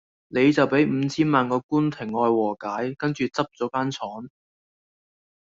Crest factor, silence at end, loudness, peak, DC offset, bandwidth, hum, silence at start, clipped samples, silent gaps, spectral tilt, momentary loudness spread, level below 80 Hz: 20 dB; 1.2 s; -23 LUFS; -4 dBFS; under 0.1%; 7.8 kHz; none; 0.3 s; under 0.1%; 1.64-1.69 s; -6.5 dB/octave; 9 LU; -64 dBFS